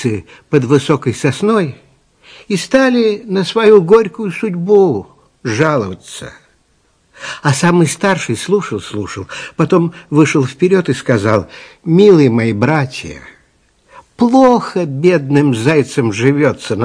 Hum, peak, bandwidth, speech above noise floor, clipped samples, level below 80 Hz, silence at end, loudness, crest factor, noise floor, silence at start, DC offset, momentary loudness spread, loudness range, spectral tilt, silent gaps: none; 0 dBFS; 10.5 kHz; 44 dB; 0.5%; -50 dBFS; 0 s; -13 LUFS; 14 dB; -56 dBFS; 0 s; under 0.1%; 15 LU; 4 LU; -6 dB/octave; none